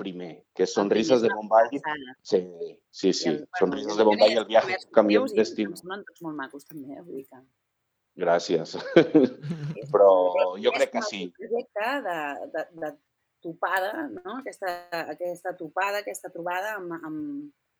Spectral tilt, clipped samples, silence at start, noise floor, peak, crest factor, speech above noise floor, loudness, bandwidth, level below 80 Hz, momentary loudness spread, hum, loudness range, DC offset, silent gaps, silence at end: -5 dB/octave; under 0.1%; 0 s; -79 dBFS; -2 dBFS; 24 dB; 53 dB; -25 LUFS; 19.5 kHz; -76 dBFS; 18 LU; none; 9 LU; under 0.1%; none; 0.3 s